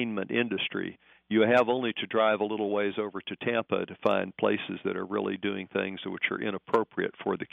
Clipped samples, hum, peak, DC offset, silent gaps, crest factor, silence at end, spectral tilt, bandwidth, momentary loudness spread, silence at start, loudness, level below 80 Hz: under 0.1%; none; -10 dBFS; under 0.1%; none; 18 dB; 0.05 s; -3 dB/octave; 5.8 kHz; 8 LU; 0 s; -29 LUFS; -74 dBFS